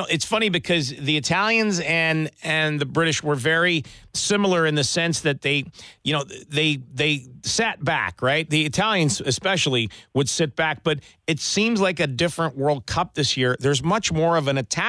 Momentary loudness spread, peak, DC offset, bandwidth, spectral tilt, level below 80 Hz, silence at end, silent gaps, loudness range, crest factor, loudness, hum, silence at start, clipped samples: 5 LU; -8 dBFS; under 0.1%; 11 kHz; -4 dB/octave; -52 dBFS; 0 s; none; 2 LU; 14 dB; -22 LUFS; none; 0 s; under 0.1%